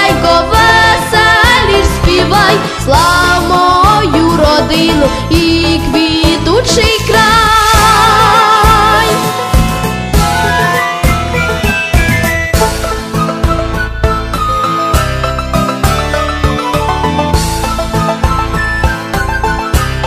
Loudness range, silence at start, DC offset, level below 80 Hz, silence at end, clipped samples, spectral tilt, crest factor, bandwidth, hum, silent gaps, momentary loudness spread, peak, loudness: 6 LU; 0 s; under 0.1%; -18 dBFS; 0 s; 0.4%; -4.5 dB/octave; 10 dB; 16 kHz; none; none; 8 LU; 0 dBFS; -9 LUFS